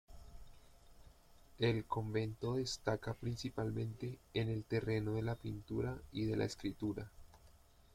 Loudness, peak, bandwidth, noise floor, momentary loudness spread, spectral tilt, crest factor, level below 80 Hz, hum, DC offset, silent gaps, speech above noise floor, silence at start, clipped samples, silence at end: -40 LUFS; -22 dBFS; 15.5 kHz; -64 dBFS; 7 LU; -6.5 dB/octave; 18 dB; -60 dBFS; none; under 0.1%; none; 25 dB; 0.1 s; under 0.1%; 0.4 s